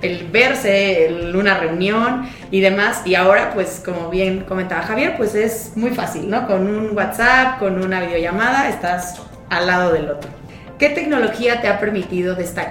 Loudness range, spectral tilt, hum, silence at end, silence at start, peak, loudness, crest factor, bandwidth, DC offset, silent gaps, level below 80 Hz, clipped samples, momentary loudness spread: 3 LU; -5 dB/octave; none; 0 s; 0 s; 0 dBFS; -17 LUFS; 18 dB; 17 kHz; under 0.1%; none; -42 dBFS; under 0.1%; 9 LU